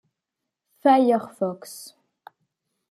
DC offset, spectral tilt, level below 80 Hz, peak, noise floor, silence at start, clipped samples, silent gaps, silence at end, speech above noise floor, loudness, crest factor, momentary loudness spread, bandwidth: under 0.1%; -5.5 dB/octave; -80 dBFS; -6 dBFS; -84 dBFS; 0.85 s; under 0.1%; none; 1.05 s; 63 dB; -21 LUFS; 20 dB; 21 LU; 14.5 kHz